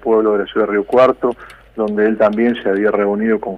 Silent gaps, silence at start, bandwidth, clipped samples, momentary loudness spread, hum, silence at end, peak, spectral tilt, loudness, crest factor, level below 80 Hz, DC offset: none; 0 s; 5.8 kHz; under 0.1%; 9 LU; none; 0 s; -2 dBFS; -7.5 dB/octave; -15 LUFS; 14 dB; -50 dBFS; under 0.1%